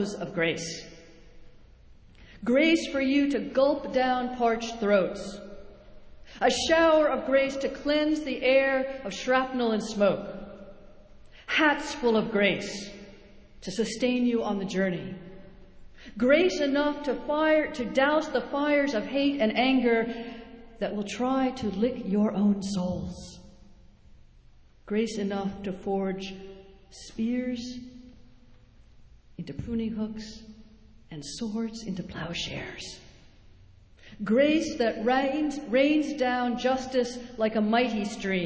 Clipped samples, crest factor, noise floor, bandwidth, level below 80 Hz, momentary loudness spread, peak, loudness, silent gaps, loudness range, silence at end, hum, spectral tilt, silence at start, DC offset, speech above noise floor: under 0.1%; 20 dB; -54 dBFS; 8 kHz; -54 dBFS; 18 LU; -8 dBFS; -27 LUFS; none; 11 LU; 0 s; none; -5 dB/octave; 0 s; under 0.1%; 28 dB